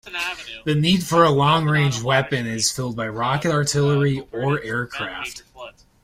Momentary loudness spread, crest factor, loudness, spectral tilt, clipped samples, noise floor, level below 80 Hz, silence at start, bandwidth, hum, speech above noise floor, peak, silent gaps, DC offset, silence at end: 13 LU; 18 dB; -20 LUFS; -4.5 dB/octave; under 0.1%; -41 dBFS; -50 dBFS; 0.05 s; 16 kHz; none; 21 dB; -4 dBFS; none; under 0.1%; 0.35 s